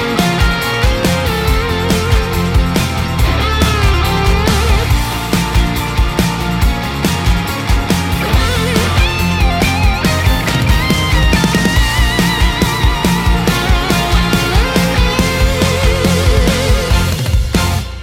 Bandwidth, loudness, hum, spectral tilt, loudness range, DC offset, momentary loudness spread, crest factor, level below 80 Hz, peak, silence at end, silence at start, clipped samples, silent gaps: 16.5 kHz; -13 LUFS; none; -5 dB/octave; 2 LU; under 0.1%; 3 LU; 12 dB; -16 dBFS; 0 dBFS; 0 s; 0 s; under 0.1%; none